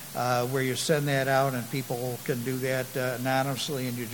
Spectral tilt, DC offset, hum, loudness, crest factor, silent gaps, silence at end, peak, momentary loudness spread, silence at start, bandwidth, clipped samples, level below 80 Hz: -4.5 dB/octave; 0.1%; none; -28 LUFS; 18 dB; none; 0 s; -10 dBFS; 7 LU; 0 s; 17.5 kHz; under 0.1%; -66 dBFS